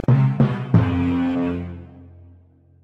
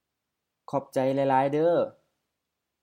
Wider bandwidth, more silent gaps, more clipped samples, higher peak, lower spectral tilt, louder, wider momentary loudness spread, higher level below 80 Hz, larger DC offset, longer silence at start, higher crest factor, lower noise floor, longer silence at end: second, 4.8 kHz vs 14 kHz; neither; neither; first, -4 dBFS vs -10 dBFS; first, -10 dB/octave vs -7.5 dB/octave; first, -20 LUFS vs -26 LUFS; first, 14 LU vs 10 LU; first, -44 dBFS vs -78 dBFS; neither; second, 0.1 s vs 0.7 s; about the same, 16 dB vs 18 dB; second, -52 dBFS vs -84 dBFS; second, 0.75 s vs 0.9 s